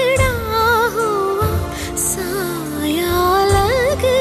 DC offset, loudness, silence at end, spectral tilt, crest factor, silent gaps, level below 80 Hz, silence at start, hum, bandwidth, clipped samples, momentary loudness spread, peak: under 0.1%; -17 LUFS; 0 s; -4 dB/octave; 14 dB; none; -32 dBFS; 0 s; none; 14 kHz; under 0.1%; 7 LU; -4 dBFS